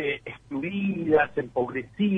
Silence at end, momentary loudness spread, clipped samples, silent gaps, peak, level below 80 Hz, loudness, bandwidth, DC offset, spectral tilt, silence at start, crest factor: 0 s; 10 LU; under 0.1%; none; -10 dBFS; -58 dBFS; -27 LUFS; 3.9 kHz; under 0.1%; -8.5 dB/octave; 0 s; 18 dB